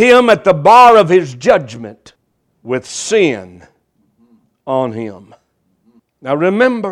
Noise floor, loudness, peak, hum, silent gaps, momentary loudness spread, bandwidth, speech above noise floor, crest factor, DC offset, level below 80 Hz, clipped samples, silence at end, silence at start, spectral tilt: -60 dBFS; -11 LUFS; 0 dBFS; none; none; 23 LU; 13.5 kHz; 48 dB; 14 dB; under 0.1%; -52 dBFS; 0.4%; 0 s; 0 s; -5 dB/octave